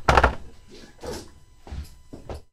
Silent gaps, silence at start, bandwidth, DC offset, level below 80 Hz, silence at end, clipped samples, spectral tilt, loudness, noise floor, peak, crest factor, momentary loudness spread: none; 0 s; 14.5 kHz; under 0.1%; -34 dBFS; 0.1 s; under 0.1%; -5 dB/octave; -24 LUFS; -46 dBFS; 0 dBFS; 26 dB; 27 LU